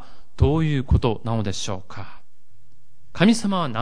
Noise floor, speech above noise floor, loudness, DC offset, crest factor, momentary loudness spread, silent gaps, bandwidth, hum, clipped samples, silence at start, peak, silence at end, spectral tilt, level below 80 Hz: -62 dBFS; 41 dB; -22 LUFS; 4%; 18 dB; 21 LU; none; 10.5 kHz; none; under 0.1%; 0.1 s; -4 dBFS; 0 s; -6 dB/octave; -32 dBFS